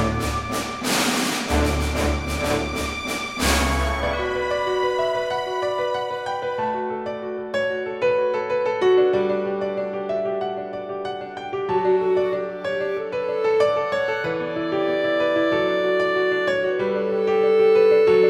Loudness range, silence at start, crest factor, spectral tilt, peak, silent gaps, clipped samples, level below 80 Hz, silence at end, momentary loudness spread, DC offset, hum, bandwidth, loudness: 3 LU; 0 s; 16 dB; -4.5 dB/octave; -6 dBFS; none; under 0.1%; -36 dBFS; 0 s; 8 LU; under 0.1%; none; 16.5 kHz; -22 LUFS